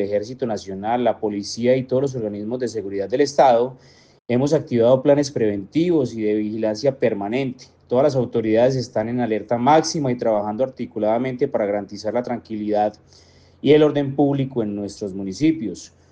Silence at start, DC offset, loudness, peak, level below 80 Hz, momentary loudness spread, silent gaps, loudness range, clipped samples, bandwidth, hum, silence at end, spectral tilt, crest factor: 0 s; under 0.1%; -21 LUFS; -2 dBFS; -62 dBFS; 10 LU; 4.21-4.25 s; 3 LU; under 0.1%; 9.4 kHz; none; 0.25 s; -6.5 dB/octave; 18 dB